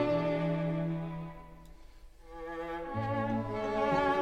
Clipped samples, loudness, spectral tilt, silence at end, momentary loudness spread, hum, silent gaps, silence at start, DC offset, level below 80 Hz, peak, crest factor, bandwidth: under 0.1%; -34 LUFS; -8 dB/octave; 0 s; 16 LU; none; none; 0 s; under 0.1%; -52 dBFS; -18 dBFS; 16 dB; 8.4 kHz